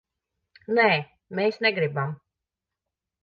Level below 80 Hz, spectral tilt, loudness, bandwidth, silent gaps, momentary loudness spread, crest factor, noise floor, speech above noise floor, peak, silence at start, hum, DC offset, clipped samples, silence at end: -72 dBFS; -7.5 dB/octave; -24 LUFS; 6.8 kHz; none; 13 LU; 20 dB; -87 dBFS; 63 dB; -8 dBFS; 0.7 s; none; under 0.1%; under 0.1%; 1.1 s